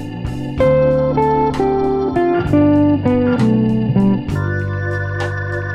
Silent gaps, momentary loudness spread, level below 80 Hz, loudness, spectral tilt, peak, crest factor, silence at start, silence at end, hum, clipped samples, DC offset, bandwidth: none; 8 LU; -34 dBFS; -16 LUFS; -9 dB/octave; -2 dBFS; 14 dB; 0 s; 0 s; none; under 0.1%; under 0.1%; 10.5 kHz